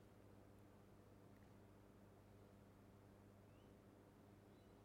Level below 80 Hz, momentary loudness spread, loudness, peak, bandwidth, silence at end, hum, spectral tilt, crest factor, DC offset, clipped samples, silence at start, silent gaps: -78 dBFS; 1 LU; -68 LUFS; -54 dBFS; 16 kHz; 0 s; 50 Hz at -70 dBFS; -6.5 dB/octave; 12 dB; under 0.1%; under 0.1%; 0 s; none